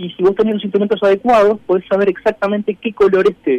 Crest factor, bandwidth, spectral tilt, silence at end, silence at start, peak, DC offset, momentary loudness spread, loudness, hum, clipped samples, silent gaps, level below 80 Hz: 10 dB; 8.4 kHz; -7 dB/octave; 0 s; 0 s; -4 dBFS; under 0.1%; 6 LU; -15 LUFS; none; under 0.1%; none; -50 dBFS